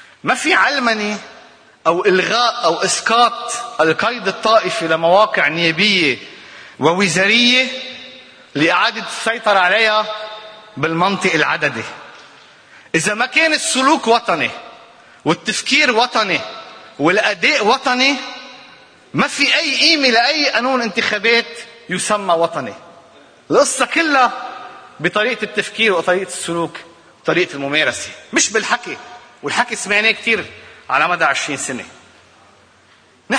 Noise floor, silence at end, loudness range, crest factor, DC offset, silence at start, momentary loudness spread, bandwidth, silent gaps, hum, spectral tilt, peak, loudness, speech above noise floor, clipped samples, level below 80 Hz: -50 dBFS; 0 s; 4 LU; 18 dB; under 0.1%; 0.25 s; 17 LU; 10.5 kHz; none; none; -2.5 dB/octave; 0 dBFS; -15 LUFS; 34 dB; under 0.1%; -62 dBFS